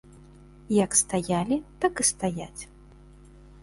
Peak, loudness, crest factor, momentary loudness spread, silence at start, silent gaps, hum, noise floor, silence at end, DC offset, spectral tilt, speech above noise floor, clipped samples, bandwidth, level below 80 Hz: -8 dBFS; -25 LUFS; 20 dB; 18 LU; 0.15 s; none; none; -50 dBFS; 1 s; under 0.1%; -4 dB/octave; 24 dB; under 0.1%; 11.5 kHz; -52 dBFS